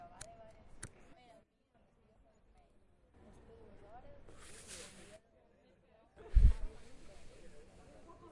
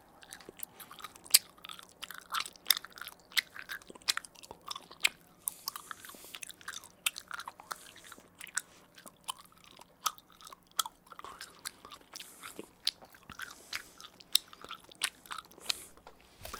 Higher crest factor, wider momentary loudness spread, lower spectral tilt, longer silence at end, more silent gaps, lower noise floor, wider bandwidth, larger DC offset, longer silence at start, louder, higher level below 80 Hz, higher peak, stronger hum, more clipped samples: second, 26 dB vs 40 dB; first, 28 LU vs 20 LU; first, -5.5 dB/octave vs 1.5 dB/octave; first, 1.1 s vs 0 s; neither; first, -72 dBFS vs -58 dBFS; second, 11.5 kHz vs 18 kHz; neither; first, 0.85 s vs 0.2 s; second, -39 LUFS vs -36 LUFS; first, -42 dBFS vs -72 dBFS; second, -14 dBFS vs 0 dBFS; neither; neither